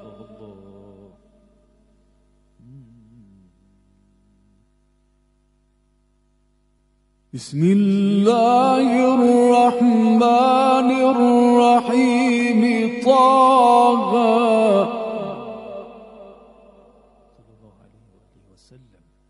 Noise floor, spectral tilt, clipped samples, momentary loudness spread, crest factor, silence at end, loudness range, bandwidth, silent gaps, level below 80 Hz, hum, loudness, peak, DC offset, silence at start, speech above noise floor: -62 dBFS; -6.5 dB/octave; under 0.1%; 16 LU; 16 dB; 3.05 s; 10 LU; 11.5 kHz; none; -60 dBFS; 50 Hz at -40 dBFS; -16 LUFS; -2 dBFS; under 0.1%; 0.05 s; 48 dB